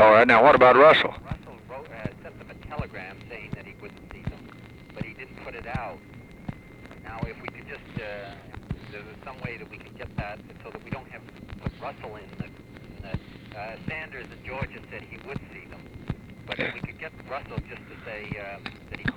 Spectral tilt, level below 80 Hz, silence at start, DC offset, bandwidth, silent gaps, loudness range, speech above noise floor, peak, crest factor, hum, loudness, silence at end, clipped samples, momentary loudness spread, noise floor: -6.5 dB/octave; -48 dBFS; 0 s; under 0.1%; 10.5 kHz; none; 14 LU; 19 dB; -4 dBFS; 22 dB; none; -24 LUFS; 0 s; under 0.1%; 19 LU; -45 dBFS